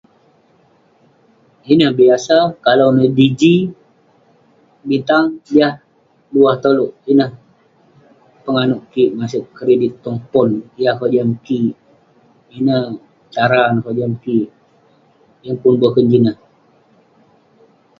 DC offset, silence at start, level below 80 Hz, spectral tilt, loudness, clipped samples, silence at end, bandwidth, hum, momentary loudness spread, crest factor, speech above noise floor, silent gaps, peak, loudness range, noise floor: under 0.1%; 1.65 s; -58 dBFS; -7 dB/octave; -15 LUFS; under 0.1%; 1.65 s; 7.6 kHz; none; 11 LU; 16 dB; 40 dB; none; 0 dBFS; 5 LU; -53 dBFS